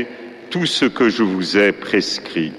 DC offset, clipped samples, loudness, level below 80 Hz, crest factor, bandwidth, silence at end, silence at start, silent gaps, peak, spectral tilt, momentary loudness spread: under 0.1%; under 0.1%; -17 LUFS; -58 dBFS; 16 dB; 12.5 kHz; 0 s; 0 s; none; -2 dBFS; -4.5 dB/octave; 11 LU